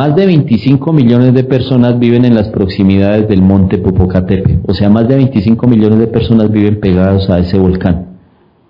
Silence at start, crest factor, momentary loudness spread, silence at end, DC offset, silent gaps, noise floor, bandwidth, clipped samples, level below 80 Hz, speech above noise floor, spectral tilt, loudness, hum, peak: 0 s; 8 dB; 3 LU; 0.55 s; under 0.1%; none; -46 dBFS; 6 kHz; 3%; -32 dBFS; 38 dB; -10.5 dB/octave; -9 LUFS; none; 0 dBFS